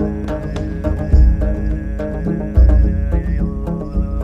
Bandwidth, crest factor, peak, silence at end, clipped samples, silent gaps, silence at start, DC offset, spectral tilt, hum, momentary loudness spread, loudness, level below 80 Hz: 5.4 kHz; 12 dB; -2 dBFS; 0 s; under 0.1%; none; 0 s; under 0.1%; -9.5 dB/octave; none; 10 LU; -18 LUFS; -16 dBFS